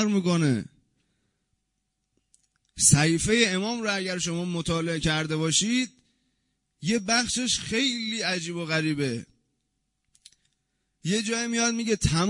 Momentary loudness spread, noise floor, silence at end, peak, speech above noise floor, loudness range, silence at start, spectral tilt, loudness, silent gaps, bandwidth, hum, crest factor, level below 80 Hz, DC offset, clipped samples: 9 LU; -79 dBFS; 0 s; -6 dBFS; 53 dB; 6 LU; 0 s; -3.5 dB/octave; -25 LUFS; none; 11 kHz; none; 22 dB; -50 dBFS; under 0.1%; under 0.1%